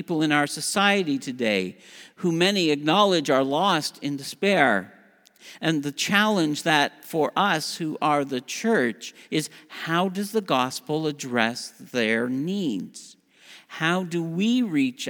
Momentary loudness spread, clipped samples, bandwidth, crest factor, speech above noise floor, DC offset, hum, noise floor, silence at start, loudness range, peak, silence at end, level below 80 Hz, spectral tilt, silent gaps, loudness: 9 LU; under 0.1%; over 20 kHz; 22 dB; 27 dB; under 0.1%; none; -51 dBFS; 0 s; 4 LU; -4 dBFS; 0 s; -78 dBFS; -4 dB/octave; none; -24 LUFS